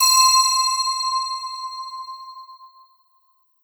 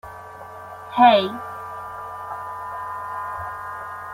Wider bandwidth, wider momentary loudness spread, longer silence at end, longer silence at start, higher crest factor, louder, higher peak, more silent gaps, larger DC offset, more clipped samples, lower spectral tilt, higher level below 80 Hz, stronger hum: first, over 20 kHz vs 16 kHz; about the same, 22 LU vs 23 LU; first, 0.95 s vs 0 s; about the same, 0 s vs 0.05 s; about the same, 18 dB vs 22 dB; first, -17 LUFS vs -23 LUFS; about the same, -4 dBFS vs -2 dBFS; neither; neither; neither; second, 10.5 dB/octave vs -5.5 dB/octave; second, -82 dBFS vs -60 dBFS; neither